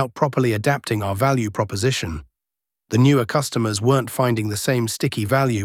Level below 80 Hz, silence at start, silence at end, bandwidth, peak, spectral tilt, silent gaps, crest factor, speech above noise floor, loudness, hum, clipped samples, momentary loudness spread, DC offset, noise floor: -48 dBFS; 0 s; 0 s; 16.5 kHz; -4 dBFS; -5.5 dB/octave; none; 16 dB; 67 dB; -20 LUFS; none; under 0.1%; 7 LU; under 0.1%; -87 dBFS